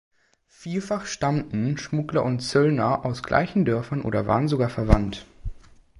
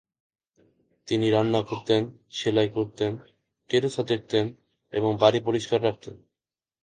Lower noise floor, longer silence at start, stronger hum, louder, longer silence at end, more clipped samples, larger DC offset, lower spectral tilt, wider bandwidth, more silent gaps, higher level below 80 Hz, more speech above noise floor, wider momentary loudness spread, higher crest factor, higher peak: second, -60 dBFS vs under -90 dBFS; second, 0.6 s vs 1.05 s; neither; about the same, -24 LUFS vs -25 LUFS; second, 0.4 s vs 0.65 s; neither; neither; about the same, -6.5 dB/octave vs -6 dB/octave; first, 11.5 kHz vs 9.4 kHz; neither; first, -36 dBFS vs -62 dBFS; second, 37 dB vs over 65 dB; about the same, 11 LU vs 12 LU; about the same, 22 dB vs 22 dB; about the same, -2 dBFS vs -4 dBFS